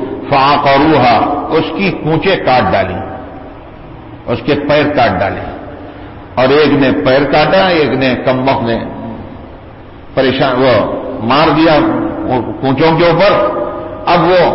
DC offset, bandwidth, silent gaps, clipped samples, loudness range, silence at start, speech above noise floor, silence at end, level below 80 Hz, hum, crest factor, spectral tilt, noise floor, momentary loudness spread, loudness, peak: under 0.1%; 5.8 kHz; none; under 0.1%; 4 LU; 0 s; 22 dB; 0 s; -36 dBFS; none; 10 dB; -10 dB/octave; -32 dBFS; 19 LU; -11 LUFS; 0 dBFS